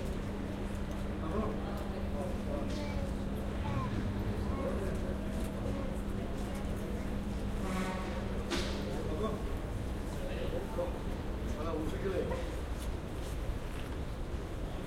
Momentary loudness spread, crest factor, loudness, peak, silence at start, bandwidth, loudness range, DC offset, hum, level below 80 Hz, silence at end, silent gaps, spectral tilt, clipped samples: 4 LU; 16 dB; -38 LUFS; -20 dBFS; 0 s; 16 kHz; 1 LU; under 0.1%; none; -40 dBFS; 0 s; none; -6.5 dB/octave; under 0.1%